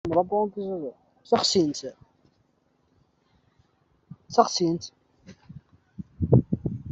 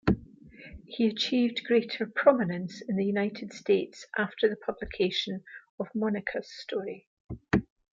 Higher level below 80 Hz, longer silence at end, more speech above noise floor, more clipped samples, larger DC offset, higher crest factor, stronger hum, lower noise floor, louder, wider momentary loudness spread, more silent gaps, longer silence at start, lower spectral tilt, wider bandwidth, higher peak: about the same, -52 dBFS vs -52 dBFS; second, 0 s vs 0.3 s; first, 43 dB vs 21 dB; neither; neither; about the same, 24 dB vs 22 dB; neither; first, -68 dBFS vs -50 dBFS; first, -25 LUFS vs -29 LUFS; first, 20 LU vs 16 LU; second, none vs 5.69-5.78 s, 7.07-7.29 s; about the same, 0.05 s vs 0.05 s; about the same, -5.5 dB/octave vs -6 dB/octave; about the same, 8.2 kHz vs 7.6 kHz; first, -4 dBFS vs -8 dBFS